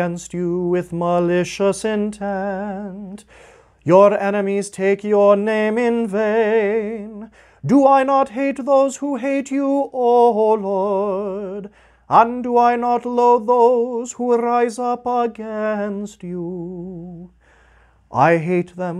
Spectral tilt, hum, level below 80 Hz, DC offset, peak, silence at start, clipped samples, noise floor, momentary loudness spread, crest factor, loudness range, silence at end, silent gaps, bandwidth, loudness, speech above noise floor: -6.5 dB/octave; none; -56 dBFS; under 0.1%; 0 dBFS; 0 s; under 0.1%; -53 dBFS; 15 LU; 18 dB; 6 LU; 0 s; none; 11.5 kHz; -18 LUFS; 35 dB